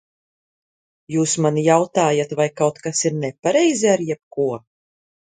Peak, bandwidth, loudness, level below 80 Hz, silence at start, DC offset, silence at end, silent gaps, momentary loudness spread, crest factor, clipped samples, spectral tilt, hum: 0 dBFS; 9.6 kHz; -19 LUFS; -66 dBFS; 1.1 s; under 0.1%; 0.8 s; 4.23-4.31 s; 8 LU; 20 dB; under 0.1%; -4.5 dB/octave; none